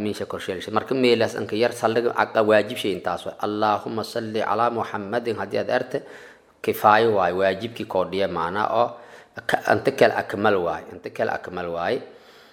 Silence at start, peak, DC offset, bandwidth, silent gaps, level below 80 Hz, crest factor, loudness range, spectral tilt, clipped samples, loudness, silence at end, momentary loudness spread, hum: 0 s; -2 dBFS; under 0.1%; 16.5 kHz; none; -64 dBFS; 22 dB; 3 LU; -5 dB/octave; under 0.1%; -23 LUFS; 0.4 s; 11 LU; none